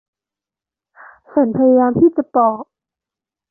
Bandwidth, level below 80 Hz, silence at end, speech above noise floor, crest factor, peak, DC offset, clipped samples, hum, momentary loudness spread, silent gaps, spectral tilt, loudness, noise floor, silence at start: 2.1 kHz; -54 dBFS; 0.85 s; 75 dB; 14 dB; -2 dBFS; under 0.1%; under 0.1%; none; 7 LU; none; -13.5 dB/octave; -15 LUFS; -89 dBFS; 1.35 s